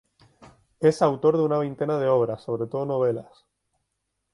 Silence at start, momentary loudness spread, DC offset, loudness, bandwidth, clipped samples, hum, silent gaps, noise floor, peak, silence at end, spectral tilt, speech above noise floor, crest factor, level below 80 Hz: 0.4 s; 8 LU; under 0.1%; -24 LUFS; 11 kHz; under 0.1%; none; none; -78 dBFS; -6 dBFS; 1.1 s; -7.5 dB/octave; 55 dB; 20 dB; -64 dBFS